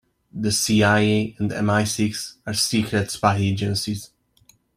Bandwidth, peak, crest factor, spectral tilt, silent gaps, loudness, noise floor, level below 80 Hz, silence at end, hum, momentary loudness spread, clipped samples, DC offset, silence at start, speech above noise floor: 15.5 kHz; -4 dBFS; 20 dB; -4.5 dB/octave; none; -21 LUFS; -58 dBFS; -54 dBFS; 0.7 s; none; 11 LU; under 0.1%; under 0.1%; 0.35 s; 37 dB